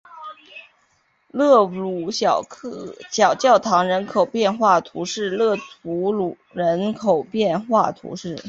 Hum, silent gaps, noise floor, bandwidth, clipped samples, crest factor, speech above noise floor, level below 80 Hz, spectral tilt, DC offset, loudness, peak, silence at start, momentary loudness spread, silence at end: none; none; -63 dBFS; 7.8 kHz; under 0.1%; 18 dB; 44 dB; -64 dBFS; -4.5 dB/octave; under 0.1%; -20 LUFS; -2 dBFS; 0.1 s; 17 LU; 0 s